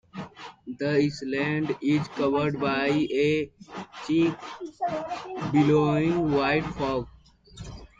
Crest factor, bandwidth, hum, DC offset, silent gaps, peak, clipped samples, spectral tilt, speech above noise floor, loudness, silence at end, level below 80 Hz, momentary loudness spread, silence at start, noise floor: 16 dB; 7.8 kHz; none; under 0.1%; none; -10 dBFS; under 0.1%; -7 dB/octave; 21 dB; -26 LUFS; 0.15 s; -52 dBFS; 18 LU; 0.15 s; -46 dBFS